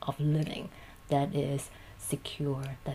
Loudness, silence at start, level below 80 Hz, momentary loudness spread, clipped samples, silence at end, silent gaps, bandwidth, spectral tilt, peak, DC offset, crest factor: -33 LUFS; 0 s; -56 dBFS; 13 LU; under 0.1%; 0 s; none; 15.5 kHz; -6 dB/octave; -14 dBFS; under 0.1%; 18 dB